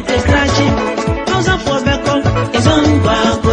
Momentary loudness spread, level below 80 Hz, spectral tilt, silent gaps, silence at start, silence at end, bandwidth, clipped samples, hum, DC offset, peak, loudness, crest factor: 4 LU; -26 dBFS; -5.5 dB/octave; none; 0 s; 0 s; 10 kHz; under 0.1%; none; under 0.1%; 0 dBFS; -13 LUFS; 12 dB